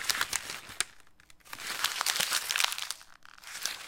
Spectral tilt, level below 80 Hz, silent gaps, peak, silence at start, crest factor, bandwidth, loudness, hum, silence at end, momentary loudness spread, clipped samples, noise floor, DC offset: 2 dB/octave; -66 dBFS; none; -4 dBFS; 0 s; 32 dB; 17 kHz; -31 LUFS; none; 0 s; 14 LU; under 0.1%; -56 dBFS; under 0.1%